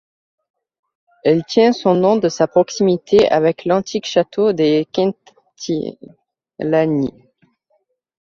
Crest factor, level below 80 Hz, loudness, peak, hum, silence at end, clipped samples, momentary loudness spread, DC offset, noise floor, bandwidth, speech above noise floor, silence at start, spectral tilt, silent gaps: 16 dB; -56 dBFS; -16 LUFS; -2 dBFS; none; 1.15 s; under 0.1%; 9 LU; under 0.1%; -65 dBFS; 7.6 kHz; 50 dB; 1.25 s; -6 dB/octave; none